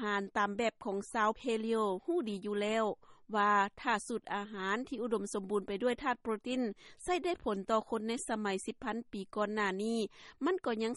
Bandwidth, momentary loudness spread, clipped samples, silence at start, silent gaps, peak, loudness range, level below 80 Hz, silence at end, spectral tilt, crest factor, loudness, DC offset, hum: 11.5 kHz; 6 LU; under 0.1%; 0 s; none; -18 dBFS; 3 LU; -66 dBFS; 0 s; -4.5 dB/octave; 18 dB; -35 LUFS; under 0.1%; none